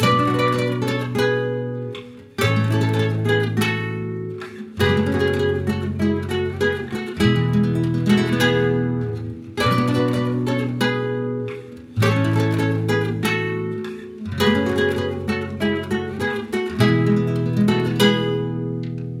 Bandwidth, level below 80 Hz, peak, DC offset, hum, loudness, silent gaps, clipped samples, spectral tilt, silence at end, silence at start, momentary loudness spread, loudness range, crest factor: 16 kHz; -48 dBFS; -4 dBFS; under 0.1%; none; -21 LUFS; none; under 0.1%; -6.5 dB/octave; 0 s; 0 s; 11 LU; 2 LU; 18 dB